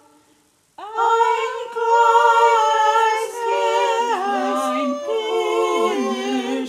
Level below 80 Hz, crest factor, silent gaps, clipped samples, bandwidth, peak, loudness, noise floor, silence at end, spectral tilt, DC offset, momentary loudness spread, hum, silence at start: -78 dBFS; 16 dB; none; under 0.1%; 15.5 kHz; -2 dBFS; -18 LUFS; -59 dBFS; 0 s; -2 dB/octave; under 0.1%; 9 LU; none; 0.8 s